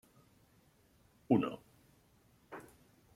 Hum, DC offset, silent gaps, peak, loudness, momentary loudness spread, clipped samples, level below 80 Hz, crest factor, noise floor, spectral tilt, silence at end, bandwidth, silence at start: none; under 0.1%; none; -16 dBFS; -34 LUFS; 21 LU; under 0.1%; -74 dBFS; 26 dB; -69 dBFS; -8 dB/octave; 0.55 s; 15 kHz; 1.3 s